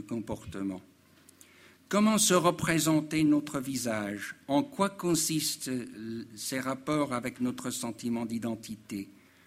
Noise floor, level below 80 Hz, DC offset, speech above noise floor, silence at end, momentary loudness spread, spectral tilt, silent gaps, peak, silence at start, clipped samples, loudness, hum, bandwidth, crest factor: -59 dBFS; -64 dBFS; under 0.1%; 28 dB; 0.35 s; 14 LU; -4 dB/octave; none; -10 dBFS; 0 s; under 0.1%; -30 LUFS; none; 16 kHz; 22 dB